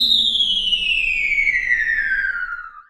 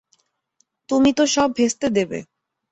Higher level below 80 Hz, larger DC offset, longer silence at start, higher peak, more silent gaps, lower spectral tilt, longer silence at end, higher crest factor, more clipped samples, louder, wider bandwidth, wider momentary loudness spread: first, -42 dBFS vs -54 dBFS; neither; second, 0 s vs 0.9 s; about the same, -4 dBFS vs -4 dBFS; neither; second, 0.5 dB/octave vs -3.5 dB/octave; second, 0.1 s vs 0.5 s; about the same, 14 dB vs 16 dB; neither; first, -16 LUFS vs -19 LUFS; first, 16.5 kHz vs 8.2 kHz; about the same, 8 LU vs 9 LU